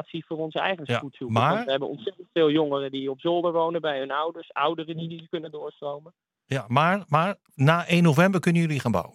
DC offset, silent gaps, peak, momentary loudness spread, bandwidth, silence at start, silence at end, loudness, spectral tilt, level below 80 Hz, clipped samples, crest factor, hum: under 0.1%; none; -4 dBFS; 14 LU; 14 kHz; 0 s; 0.05 s; -25 LUFS; -6.5 dB/octave; -68 dBFS; under 0.1%; 20 dB; none